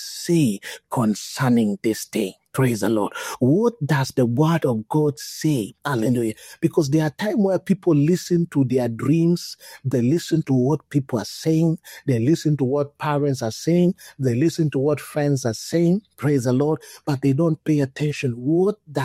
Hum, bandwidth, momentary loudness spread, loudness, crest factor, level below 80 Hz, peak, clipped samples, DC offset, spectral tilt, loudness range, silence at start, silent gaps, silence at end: none; 16 kHz; 6 LU; -21 LUFS; 14 dB; -60 dBFS; -6 dBFS; under 0.1%; under 0.1%; -6.5 dB/octave; 1 LU; 0 s; none; 0 s